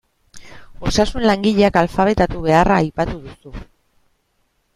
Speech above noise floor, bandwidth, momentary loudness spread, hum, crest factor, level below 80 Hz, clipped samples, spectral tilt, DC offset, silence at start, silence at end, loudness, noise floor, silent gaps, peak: 49 dB; 13 kHz; 22 LU; none; 18 dB; -34 dBFS; under 0.1%; -6 dB/octave; under 0.1%; 0.35 s; 1.15 s; -17 LUFS; -65 dBFS; none; 0 dBFS